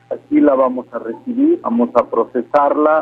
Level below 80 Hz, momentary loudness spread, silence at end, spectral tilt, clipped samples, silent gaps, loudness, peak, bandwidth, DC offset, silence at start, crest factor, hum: -60 dBFS; 11 LU; 0 s; -8.5 dB/octave; under 0.1%; none; -16 LUFS; 0 dBFS; 4.8 kHz; under 0.1%; 0.1 s; 16 dB; none